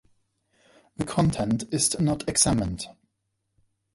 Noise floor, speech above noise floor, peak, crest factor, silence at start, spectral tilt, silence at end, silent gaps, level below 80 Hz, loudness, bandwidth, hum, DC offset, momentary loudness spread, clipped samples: -78 dBFS; 53 dB; -6 dBFS; 22 dB; 1 s; -4.5 dB/octave; 1.05 s; none; -46 dBFS; -24 LUFS; 12 kHz; none; under 0.1%; 13 LU; under 0.1%